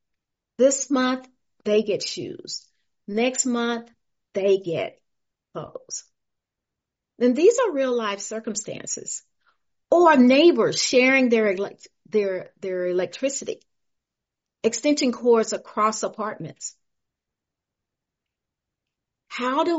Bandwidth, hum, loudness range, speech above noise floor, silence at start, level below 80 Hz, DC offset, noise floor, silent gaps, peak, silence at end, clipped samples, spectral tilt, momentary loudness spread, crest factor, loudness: 8 kHz; none; 11 LU; 64 dB; 0.6 s; -72 dBFS; under 0.1%; -86 dBFS; none; -4 dBFS; 0 s; under 0.1%; -2.5 dB/octave; 17 LU; 20 dB; -22 LUFS